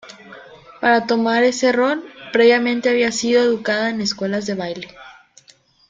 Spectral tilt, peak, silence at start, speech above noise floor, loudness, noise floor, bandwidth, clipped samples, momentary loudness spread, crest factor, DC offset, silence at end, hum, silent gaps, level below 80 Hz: -4 dB/octave; -2 dBFS; 0.05 s; 36 dB; -18 LUFS; -53 dBFS; 9.2 kHz; under 0.1%; 12 LU; 16 dB; under 0.1%; 0.75 s; none; none; -62 dBFS